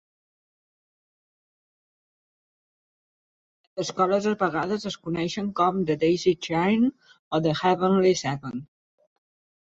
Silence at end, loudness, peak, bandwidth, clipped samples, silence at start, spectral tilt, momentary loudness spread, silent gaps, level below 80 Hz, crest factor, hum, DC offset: 1.05 s; -24 LUFS; -8 dBFS; 8 kHz; under 0.1%; 3.75 s; -5.5 dB/octave; 10 LU; 7.19-7.31 s; -64 dBFS; 18 dB; none; under 0.1%